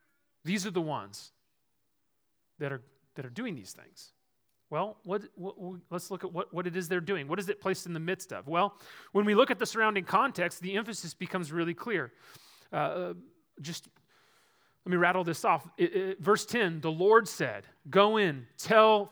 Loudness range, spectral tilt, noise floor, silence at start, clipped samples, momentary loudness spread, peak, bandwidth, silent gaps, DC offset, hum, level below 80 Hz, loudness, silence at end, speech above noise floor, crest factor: 12 LU; -4.5 dB/octave; -80 dBFS; 0.45 s; under 0.1%; 19 LU; -8 dBFS; over 20 kHz; none; under 0.1%; none; -82 dBFS; -30 LUFS; 0 s; 50 dB; 24 dB